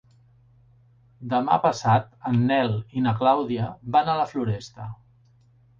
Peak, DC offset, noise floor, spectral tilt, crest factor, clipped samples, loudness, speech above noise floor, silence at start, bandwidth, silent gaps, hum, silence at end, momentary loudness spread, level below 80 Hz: -6 dBFS; under 0.1%; -58 dBFS; -7 dB/octave; 18 dB; under 0.1%; -23 LUFS; 35 dB; 1.2 s; 7.4 kHz; none; none; 0.85 s; 12 LU; -58 dBFS